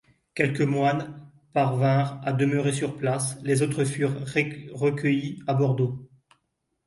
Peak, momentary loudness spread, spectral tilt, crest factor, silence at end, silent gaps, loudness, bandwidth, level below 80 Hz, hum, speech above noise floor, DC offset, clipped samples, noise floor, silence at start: -6 dBFS; 6 LU; -6 dB/octave; 20 dB; 0.8 s; none; -25 LUFS; 11.5 kHz; -64 dBFS; none; 52 dB; under 0.1%; under 0.1%; -77 dBFS; 0.35 s